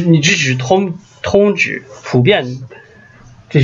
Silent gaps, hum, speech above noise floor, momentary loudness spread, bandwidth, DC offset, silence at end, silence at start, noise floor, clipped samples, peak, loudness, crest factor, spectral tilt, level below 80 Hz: none; none; 28 dB; 14 LU; 7.6 kHz; under 0.1%; 0 s; 0 s; -41 dBFS; under 0.1%; 0 dBFS; -14 LUFS; 14 dB; -5 dB/octave; -48 dBFS